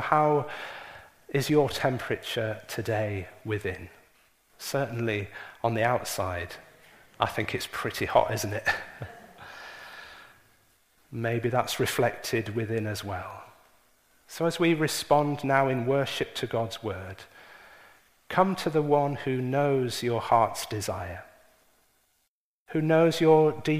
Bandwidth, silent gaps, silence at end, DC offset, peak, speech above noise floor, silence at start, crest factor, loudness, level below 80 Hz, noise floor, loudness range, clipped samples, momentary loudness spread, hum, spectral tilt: 15.5 kHz; 22.28-22.66 s; 0 s; under 0.1%; -6 dBFS; 50 dB; 0 s; 22 dB; -27 LUFS; -60 dBFS; -77 dBFS; 5 LU; under 0.1%; 19 LU; none; -5.5 dB/octave